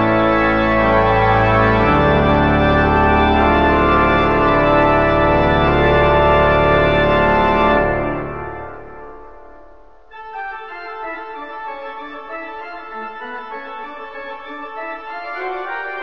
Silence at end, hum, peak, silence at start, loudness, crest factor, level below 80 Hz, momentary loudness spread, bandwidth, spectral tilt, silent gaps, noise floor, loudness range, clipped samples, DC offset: 0 s; none; -2 dBFS; 0 s; -14 LUFS; 14 dB; -28 dBFS; 17 LU; 7.4 kHz; -8 dB/octave; none; -46 dBFS; 17 LU; under 0.1%; 1%